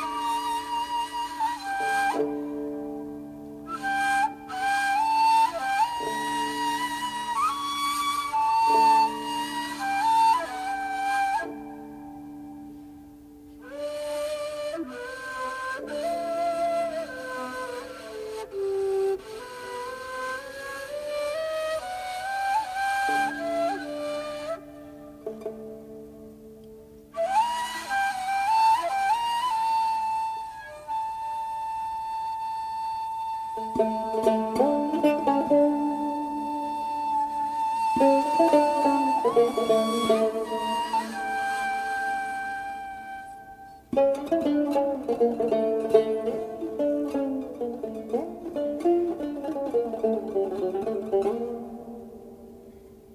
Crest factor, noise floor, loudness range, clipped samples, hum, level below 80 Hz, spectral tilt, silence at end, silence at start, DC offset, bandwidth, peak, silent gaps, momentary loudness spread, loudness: 22 dB; -48 dBFS; 8 LU; under 0.1%; none; -60 dBFS; -3.5 dB/octave; 0 s; 0 s; under 0.1%; 15.5 kHz; -6 dBFS; none; 17 LU; -27 LUFS